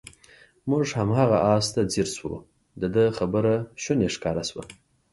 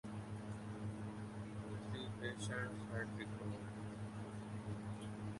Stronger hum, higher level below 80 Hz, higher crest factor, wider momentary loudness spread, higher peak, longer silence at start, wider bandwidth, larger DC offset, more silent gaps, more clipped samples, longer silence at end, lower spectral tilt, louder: neither; first, -52 dBFS vs -64 dBFS; about the same, 18 dB vs 16 dB; first, 13 LU vs 5 LU; first, -6 dBFS vs -30 dBFS; first, 0.65 s vs 0.05 s; about the same, 11.5 kHz vs 11.5 kHz; neither; neither; neither; first, 0.4 s vs 0 s; about the same, -5.5 dB/octave vs -6 dB/octave; first, -24 LUFS vs -47 LUFS